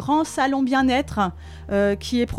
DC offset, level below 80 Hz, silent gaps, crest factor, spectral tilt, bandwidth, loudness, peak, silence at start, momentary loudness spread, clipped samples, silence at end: under 0.1%; -40 dBFS; none; 14 dB; -5 dB/octave; 14 kHz; -22 LUFS; -8 dBFS; 0 s; 7 LU; under 0.1%; 0 s